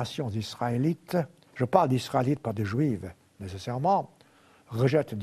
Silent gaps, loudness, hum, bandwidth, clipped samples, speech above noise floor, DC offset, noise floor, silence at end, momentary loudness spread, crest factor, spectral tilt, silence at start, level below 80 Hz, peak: none; -28 LUFS; none; 13.5 kHz; under 0.1%; 31 dB; under 0.1%; -59 dBFS; 0 s; 14 LU; 24 dB; -7 dB/octave; 0 s; -62 dBFS; -4 dBFS